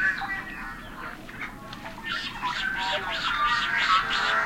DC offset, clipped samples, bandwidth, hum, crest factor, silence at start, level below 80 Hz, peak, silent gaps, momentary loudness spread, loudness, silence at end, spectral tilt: under 0.1%; under 0.1%; 16.5 kHz; none; 18 dB; 0 s; -48 dBFS; -10 dBFS; none; 16 LU; -26 LUFS; 0 s; -2 dB/octave